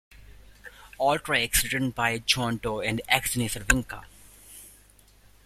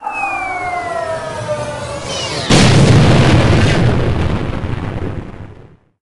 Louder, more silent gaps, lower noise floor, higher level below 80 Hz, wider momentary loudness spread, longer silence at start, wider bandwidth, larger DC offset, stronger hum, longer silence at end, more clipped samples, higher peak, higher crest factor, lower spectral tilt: second, -25 LUFS vs -14 LUFS; neither; first, -56 dBFS vs -41 dBFS; second, -44 dBFS vs -26 dBFS; first, 22 LU vs 15 LU; first, 0.15 s vs 0 s; first, 16 kHz vs 11.5 kHz; neither; first, 50 Hz at -50 dBFS vs none; first, 0.75 s vs 0 s; neither; about the same, -2 dBFS vs 0 dBFS; first, 26 dB vs 14 dB; second, -3 dB/octave vs -5.5 dB/octave